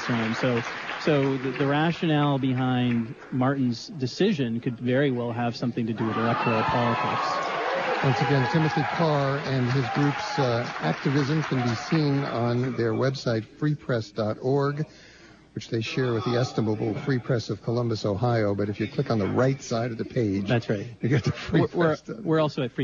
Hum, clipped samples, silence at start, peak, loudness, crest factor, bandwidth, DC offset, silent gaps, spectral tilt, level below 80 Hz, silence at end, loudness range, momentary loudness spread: none; under 0.1%; 0 s; -10 dBFS; -26 LUFS; 14 dB; 7.4 kHz; under 0.1%; none; -7 dB/octave; -58 dBFS; 0 s; 3 LU; 5 LU